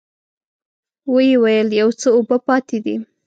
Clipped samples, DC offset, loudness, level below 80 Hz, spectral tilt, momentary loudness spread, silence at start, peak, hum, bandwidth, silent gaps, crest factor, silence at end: under 0.1%; under 0.1%; -16 LUFS; -70 dBFS; -5 dB/octave; 10 LU; 1.05 s; -4 dBFS; none; 8.8 kHz; none; 14 dB; 0.2 s